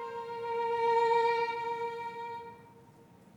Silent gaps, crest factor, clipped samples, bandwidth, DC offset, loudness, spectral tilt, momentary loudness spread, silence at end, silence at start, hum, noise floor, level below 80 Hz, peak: none; 14 dB; under 0.1%; 10.5 kHz; under 0.1%; -32 LUFS; -4 dB/octave; 15 LU; 0.45 s; 0 s; none; -58 dBFS; -78 dBFS; -18 dBFS